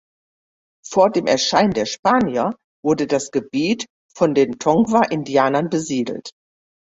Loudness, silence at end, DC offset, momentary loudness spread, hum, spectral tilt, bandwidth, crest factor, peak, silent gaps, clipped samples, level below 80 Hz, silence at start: -19 LUFS; 0.6 s; under 0.1%; 9 LU; none; -4.5 dB/octave; 8 kHz; 18 dB; -2 dBFS; 1.99-2.03 s, 2.64-2.83 s, 3.90-4.09 s; under 0.1%; -56 dBFS; 0.85 s